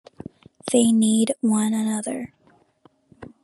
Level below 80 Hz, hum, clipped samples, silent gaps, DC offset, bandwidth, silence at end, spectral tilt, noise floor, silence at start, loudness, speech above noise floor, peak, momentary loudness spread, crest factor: -66 dBFS; none; under 0.1%; none; under 0.1%; 12.5 kHz; 0.15 s; -4.5 dB/octave; -59 dBFS; 0.65 s; -21 LUFS; 39 dB; -4 dBFS; 24 LU; 18 dB